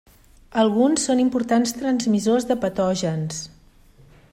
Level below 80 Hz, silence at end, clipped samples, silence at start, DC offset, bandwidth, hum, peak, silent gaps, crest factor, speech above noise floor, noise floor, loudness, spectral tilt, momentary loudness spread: -54 dBFS; 0.85 s; under 0.1%; 0.55 s; under 0.1%; 16 kHz; none; -6 dBFS; none; 16 dB; 31 dB; -51 dBFS; -21 LUFS; -5 dB/octave; 10 LU